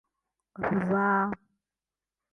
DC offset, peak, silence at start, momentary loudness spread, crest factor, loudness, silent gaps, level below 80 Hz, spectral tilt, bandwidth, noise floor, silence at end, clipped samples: under 0.1%; -14 dBFS; 0.6 s; 10 LU; 16 dB; -28 LUFS; none; -64 dBFS; -9.5 dB/octave; 3.5 kHz; under -90 dBFS; 1 s; under 0.1%